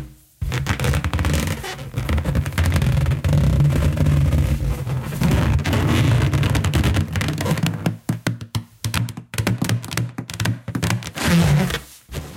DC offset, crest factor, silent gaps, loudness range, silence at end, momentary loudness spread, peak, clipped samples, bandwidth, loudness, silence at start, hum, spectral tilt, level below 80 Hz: under 0.1%; 16 dB; none; 5 LU; 0 s; 10 LU; -4 dBFS; under 0.1%; 17 kHz; -21 LUFS; 0 s; none; -5.5 dB/octave; -28 dBFS